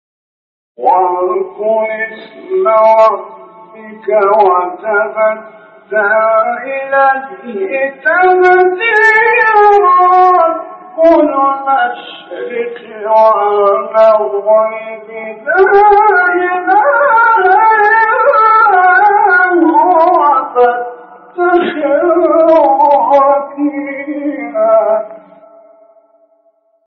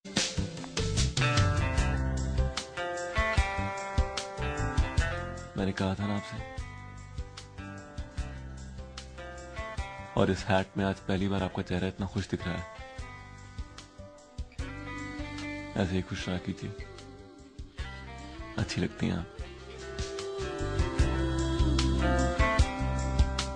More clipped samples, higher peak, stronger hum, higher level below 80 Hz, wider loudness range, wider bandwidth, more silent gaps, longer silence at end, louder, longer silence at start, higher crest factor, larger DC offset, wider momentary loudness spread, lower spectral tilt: neither; first, 0 dBFS vs -10 dBFS; neither; second, -54 dBFS vs -36 dBFS; second, 5 LU vs 10 LU; second, 6.6 kHz vs 10 kHz; neither; first, 1.7 s vs 0 s; first, -9 LUFS vs -32 LUFS; first, 0.8 s vs 0.05 s; second, 10 dB vs 22 dB; neither; second, 14 LU vs 17 LU; second, -1.5 dB/octave vs -5 dB/octave